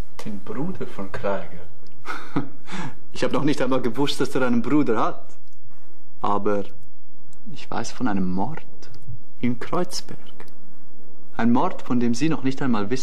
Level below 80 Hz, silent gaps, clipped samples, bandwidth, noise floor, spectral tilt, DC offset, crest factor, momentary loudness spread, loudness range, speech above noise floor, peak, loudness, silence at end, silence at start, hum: -58 dBFS; none; under 0.1%; 13.5 kHz; -56 dBFS; -6 dB/octave; 20%; 18 dB; 21 LU; 6 LU; 31 dB; -6 dBFS; -25 LUFS; 0 s; 0.2 s; none